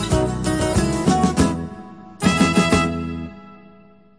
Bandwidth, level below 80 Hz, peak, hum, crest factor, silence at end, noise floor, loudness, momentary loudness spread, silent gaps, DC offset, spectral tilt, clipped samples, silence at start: 10.5 kHz; -34 dBFS; -2 dBFS; none; 18 dB; 0.65 s; -49 dBFS; -19 LUFS; 17 LU; none; 0.2%; -5.5 dB/octave; under 0.1%; 0 s